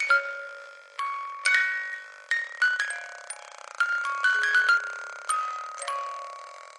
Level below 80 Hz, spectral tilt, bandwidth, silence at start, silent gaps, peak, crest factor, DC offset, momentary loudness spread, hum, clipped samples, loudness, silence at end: under -90 dBFS; 5.5 dB/octave; 11.5 kHz; 0 s; none; -8 dBFS; 20 dB; under 0.1%; 18 LU; none; under 0.1%; -26 LUFS; 0 s